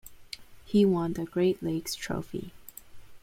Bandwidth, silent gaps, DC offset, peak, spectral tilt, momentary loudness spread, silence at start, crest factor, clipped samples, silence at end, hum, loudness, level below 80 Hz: 16.5 kHz; none; under 0.1%; -14 dBFS; -6 dB/octave; 21 LU; 0.05 s; 16 dB; under 0.1%; 0.05 s; none; -29 LUFS; -56 dBFS